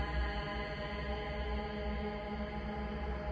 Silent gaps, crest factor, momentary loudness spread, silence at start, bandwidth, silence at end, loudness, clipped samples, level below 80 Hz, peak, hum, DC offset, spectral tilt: none; 12 dB; 3 LU; 0 s; 6.6 kHz; 0 s; -40 LUFS; under 0.1%; -42 dBFS; -26 dBFS; none; under 0.1%; -7.5 dB/octave